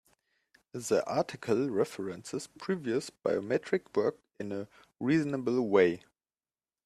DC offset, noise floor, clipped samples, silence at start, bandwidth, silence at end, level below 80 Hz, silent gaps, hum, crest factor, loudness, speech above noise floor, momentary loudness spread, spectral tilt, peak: under 0.1%; under -90 dBFS; under 0.1%; 0.75 s; 13.5 kHz; 0.85 s; -74 dBFS; none; none; 20 dB; -31 LUFS; over 59 dB; 13 LU; -6 dB/octave; -12 dBFS